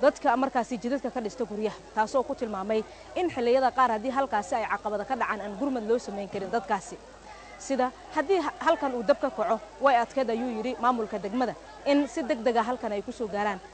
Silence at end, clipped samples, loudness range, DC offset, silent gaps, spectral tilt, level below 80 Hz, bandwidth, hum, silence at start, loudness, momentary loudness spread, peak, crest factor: 0 s; under 0.1%; 4 LU; under 0.1%; none; -4.5 dB/octave; -58 dBFS; 9 kHz; none; 0 s; -28 LUFS; 9 LU; -10 dBFS; 16 dB